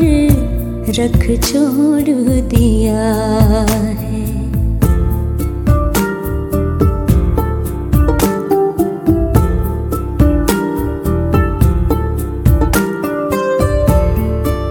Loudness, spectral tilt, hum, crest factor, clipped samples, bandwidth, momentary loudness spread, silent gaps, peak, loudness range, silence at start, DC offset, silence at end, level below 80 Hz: -14 LUFS; -7 dB/octave; none; 12 dB; under 0.1%; 18.5 kHz; 6 LU; none; 0 dBFS; 2 LU; 0 s; under 0.1%; 0 s; -18 dBFS